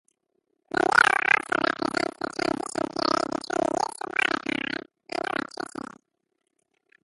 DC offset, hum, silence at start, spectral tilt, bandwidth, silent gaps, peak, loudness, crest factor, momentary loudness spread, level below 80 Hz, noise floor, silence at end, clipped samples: under 0.1%; none; 0.75 s; -3 dB/octave; 11.5 kHz; none; -4 dBFS; -25 LUFS; 24 dB; 16 LU; -64 dBFS; -78 dBFS; 1.6 s; under 0.1%